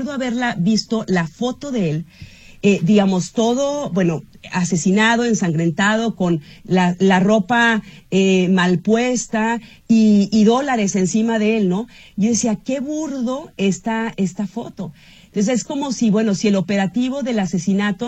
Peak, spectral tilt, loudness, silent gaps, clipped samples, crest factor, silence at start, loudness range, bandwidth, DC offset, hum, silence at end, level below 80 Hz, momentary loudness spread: -2 dBFS; -5.5 dB/octave; -18 LUFS; none; under 0.1%; 16 dB; 0 s; 5 LU; 9 kHz; under 0.1%; none; 0 s; -52 dBFS; 9 LU